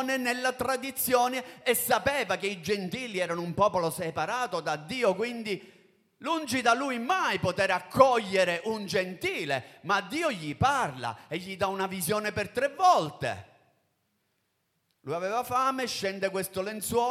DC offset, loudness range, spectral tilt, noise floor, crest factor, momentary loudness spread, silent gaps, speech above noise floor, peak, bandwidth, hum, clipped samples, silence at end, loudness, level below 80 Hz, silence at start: under 0.1%; 4 LU; -3.5 dB/octave; -76 dBFS; 24 dB; 8 LU; none; 48 dB; -6 dBFS; 16.5 kHz; none; under 0.1%; 0 s; -28 LUFS; -62 dBFS; 0 s